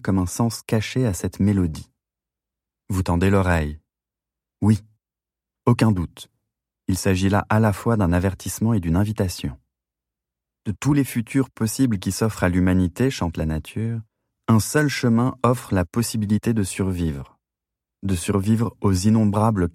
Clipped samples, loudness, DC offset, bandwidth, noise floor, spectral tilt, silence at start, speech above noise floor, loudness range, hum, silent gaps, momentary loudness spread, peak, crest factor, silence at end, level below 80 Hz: under 0.1%; -22 LUFS; under 0.1%; 16 kHz; -89 dBFS; -6.5 dB/octave; 0.05 s; 68 dB; 3 LU; none; none; 9 LU; -4 dBFS; 18 dB; 0.05 s; -42 dBFS